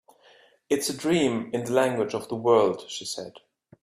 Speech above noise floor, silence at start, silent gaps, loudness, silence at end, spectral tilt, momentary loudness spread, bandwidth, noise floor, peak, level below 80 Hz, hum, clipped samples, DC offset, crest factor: 33 dB; 0.7 s; none; -25 LUFS; 0.45 s; -4.5 dB/octave; 12 LU; 15.5 kHz; -57 dBFS; -8 dBFS; -66 dBFS; none; under 0.1%; under 0.1%; 18 dB